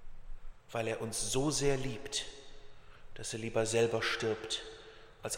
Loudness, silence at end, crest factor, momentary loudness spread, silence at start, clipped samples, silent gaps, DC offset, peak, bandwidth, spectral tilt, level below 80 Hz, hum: -34 LUFS; 0 s; 18 dB; 19 LU; 0 s; under 0.1%; none; under 0.1%; -18 dBFS; 16 kHz; -3.5 dB/octave; -50 dBFS; none